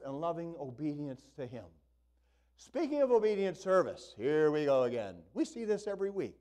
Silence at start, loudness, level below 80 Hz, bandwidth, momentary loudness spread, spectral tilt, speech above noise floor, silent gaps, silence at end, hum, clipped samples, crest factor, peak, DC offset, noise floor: 0 s; -33 LUFS; -70 dBFS; 10 kHz; 15 LU; -6.5 dB/octave; 38 dB; none; 0.1 s; none; under 0.1%; 16 dB; -18 dBFS; under 0.1%; -71 dBFS